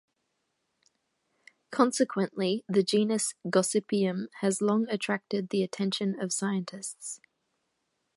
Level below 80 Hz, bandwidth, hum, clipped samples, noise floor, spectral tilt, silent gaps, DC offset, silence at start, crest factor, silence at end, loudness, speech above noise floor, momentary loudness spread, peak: -80 dBFS; 12 kHz; none; under 0.1%; -79 dBFS; -4.5 dB/octave; none; under 0.1%; 1.7 s; 22 dB; 1 s; -29 LUFS; 51 dB; 11 LU; -8 dBFS